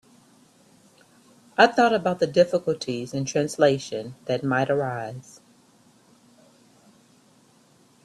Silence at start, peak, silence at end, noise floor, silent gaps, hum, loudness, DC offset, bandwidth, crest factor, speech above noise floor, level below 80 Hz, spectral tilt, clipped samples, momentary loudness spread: 1.6 s; -2 dBFS; 2.85 s; -58 dBFS; none; none; -23 LUFS; under 0.1%; 12.5 kHz; 24 dB; 35 dB; -66 dBFS; -5 dB/octave; under 0.1%; 14 LU